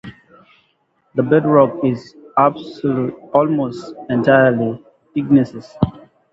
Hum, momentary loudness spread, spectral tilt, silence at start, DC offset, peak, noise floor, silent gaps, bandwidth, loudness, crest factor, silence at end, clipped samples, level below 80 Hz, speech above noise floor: none; 12 LU; -9 dB/octave; 0.05 s; under 0.1%; 0 dBFS; -63 dBFS; none; 7.6 kHz; -17 LUFS; 18 dB; 0.35 s; under 0.1%; -48 dBFS; 47 dB